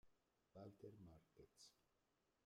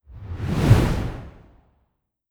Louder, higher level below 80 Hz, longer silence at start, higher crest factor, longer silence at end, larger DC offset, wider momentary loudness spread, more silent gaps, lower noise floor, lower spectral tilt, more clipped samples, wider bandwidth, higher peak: second, -65 LUFS vs -21 LUFS; second, -86 dBFS vs -32 dBFS; about the same, 0.05 s vs 0.1 s; about the same, 18 dB vs 22 dB; second, 0 s vs 1 s; neither; second, 8 LU vs 19 LU; neither; first, -87 dBFS vs -72 dBFS; second, -5.5 dB/octave vs -7 dB/octave; neither; second, 13 kHz vs 20 kHz; second, -48 dBFS vs -2 dBFS